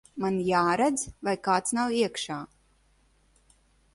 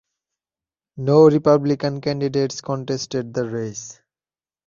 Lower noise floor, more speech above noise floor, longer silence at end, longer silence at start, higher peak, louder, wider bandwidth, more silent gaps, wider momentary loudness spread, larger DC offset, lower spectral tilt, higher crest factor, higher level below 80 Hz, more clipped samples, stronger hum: second, -65 dBFS vs under -90 dBFS; second, 38 dB vs over 71 dB; first, 1.5 s vs 0.75 s; second, 0.15 s vs 0.95 s; second, -10 dBFS vs -2 dBFS; second, -27 LUFS vs -19 LUFS; first, 11.5 kHz vs 7.4 kHz; neither; second, 10 LU vs 14 LU; neither; second, -4 dB/octave vs -6.5 dB/octave; about the same, 18 dB vs 18 dB; about the same, -60 dBFS vs -60 dBFS; neither; neither